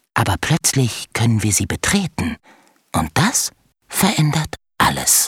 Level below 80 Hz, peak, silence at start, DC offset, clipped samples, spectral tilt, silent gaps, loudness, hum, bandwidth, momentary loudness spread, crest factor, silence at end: -42 dBFS; -2 dBFS; 0.15 s; under 0.1%; under 0.1%; -3.5 dB/octave; none; -18 LUFS; none; 18 kHz; 9 LU; 18 dB; 0 s